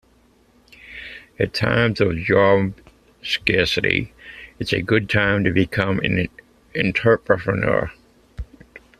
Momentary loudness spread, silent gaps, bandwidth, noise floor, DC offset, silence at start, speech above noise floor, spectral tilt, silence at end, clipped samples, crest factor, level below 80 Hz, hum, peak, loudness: 19 LU; none; 14 kHz; -56 dBFS; under 0.1%; 0.85 s; 37 dB; -6.5 dB/octave; 0.2 s; under 0.1%; 20 dB; -44 dBFS; none; 0 dBFS; -20 LUFS